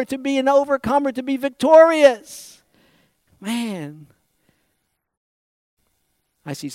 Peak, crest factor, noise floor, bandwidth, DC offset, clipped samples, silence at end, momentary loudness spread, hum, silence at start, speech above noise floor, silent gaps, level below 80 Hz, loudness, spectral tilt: -2 dBFS; 18 dB; -72 dBFS; 15.5 kHz; under 0.1%; under 0.1%; 0 s; 22 LU; none; 0 s; 55 dB; 5.17-5.77 s; -60 dBFS; -17 LUFS; -4.5 dB/octave